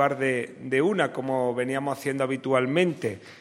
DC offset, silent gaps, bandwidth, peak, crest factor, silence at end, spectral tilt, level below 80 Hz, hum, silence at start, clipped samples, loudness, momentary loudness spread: under 0.1%; none; 16 kHz; -8 dBFS; 18 dB; 0 s; -6 dB/octave; -72 dBFS; none; 0 s; under 0.1%; -26 LUFS; 6 LU